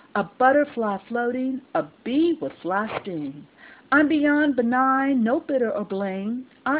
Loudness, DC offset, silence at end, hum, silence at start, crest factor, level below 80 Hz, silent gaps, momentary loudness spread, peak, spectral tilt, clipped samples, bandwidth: -23 LUFS; under 0.1%; 0 s; none; 0.15 s; 16 dB; -64 dBFS; none; 10 LU; -6 dBFS; -9.5 dB/octave; under 0.1%; 4 kHz